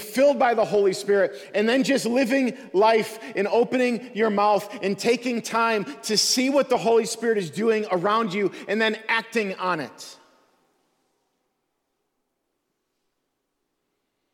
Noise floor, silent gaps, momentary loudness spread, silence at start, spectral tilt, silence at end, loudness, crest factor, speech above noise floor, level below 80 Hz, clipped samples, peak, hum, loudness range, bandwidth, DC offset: -77 dBFS; none; 7 LU; 0 s; -3.5 dB/octave; 4.2 s; -22 LUFS; 16 dB; 55 dB; -72 dBFS; under 0.1%; -8 dBFS; none; 6 LU; 18 kHz; under 0.1%